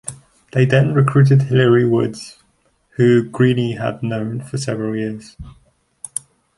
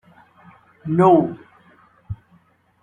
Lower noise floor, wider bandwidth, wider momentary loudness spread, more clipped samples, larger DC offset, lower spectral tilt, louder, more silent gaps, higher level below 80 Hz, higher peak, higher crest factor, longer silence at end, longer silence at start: first, -61 dBFS vs -57 dBFS; first, 11.5 kHz vs 9.6 kHz; second, 18 LU vs 22 LU; neither; neither; second, -7 dB/octave vs -10 dB/octave; about the same, -17 LUFS vs -17 LUFS; neither; first, -50 dBFS vs -56 dBFS; about the same, -2 dBFS vs -2 dBFS; about the same, 16 dB vs 20 dB; first, 1.05 s vs 0.7 s; second, 0.05 s vs 0.85 s